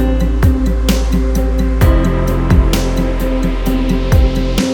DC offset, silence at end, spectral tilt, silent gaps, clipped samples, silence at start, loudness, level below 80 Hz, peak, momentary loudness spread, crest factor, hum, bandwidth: under 0.1%; 0 s; -6.5 dB/octave; none; under 0.1%; 0 s; -15 LUFS; -14 dBFS; 0 dBFS; 4 LU; 12 dB; none; 17.5 kHz